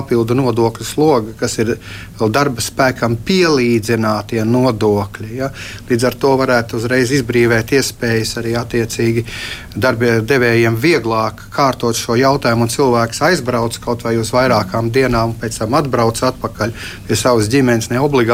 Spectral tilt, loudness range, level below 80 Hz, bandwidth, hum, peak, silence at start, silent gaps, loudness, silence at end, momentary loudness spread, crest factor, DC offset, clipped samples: -5 dB/octave; 2 LU; -38 dBFS; 16.5 kHz; none; -2 dBFS; 0 s; none; -15 LUFS; 0 s; 8 LU; 14 dB; under 0.1%; under 0.1%